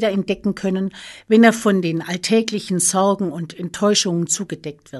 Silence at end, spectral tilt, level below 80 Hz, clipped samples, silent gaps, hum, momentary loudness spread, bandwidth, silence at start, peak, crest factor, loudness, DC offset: 0 s; -4 dB/octave; -58 dBFS; under 0.1%; none; none; 15 LU; 12.5 kHz; 0 s; -2 dBFS; 18 dB; -18 LUFS; under 0.1%